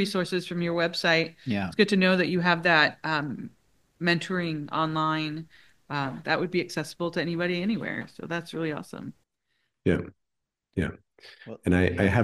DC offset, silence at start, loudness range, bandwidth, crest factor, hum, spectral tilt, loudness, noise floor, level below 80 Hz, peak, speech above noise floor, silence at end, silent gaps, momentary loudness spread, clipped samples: under 0.1%; 0 s; 9 LU; 12.5 kHz; 22 dB; none; -6 dB/octave; -27 LUFS; -83 dBFS; -54 dBFS; -4 dBFS; 57 dB; 0 s; none; 14 LU; under 0.1%